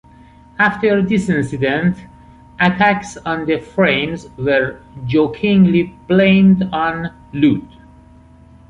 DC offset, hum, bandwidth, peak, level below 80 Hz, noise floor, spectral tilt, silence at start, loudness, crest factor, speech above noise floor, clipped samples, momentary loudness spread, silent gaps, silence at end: under 0.1%; none; 9.8 kHz; -2 dBFS; -44 dBFS; -44 dBFS; -7 dB/octave; 0.6 s; -16 LUFS; 14 dB; 29 dB; under 0.1%; 11 LU; none; 1.05 s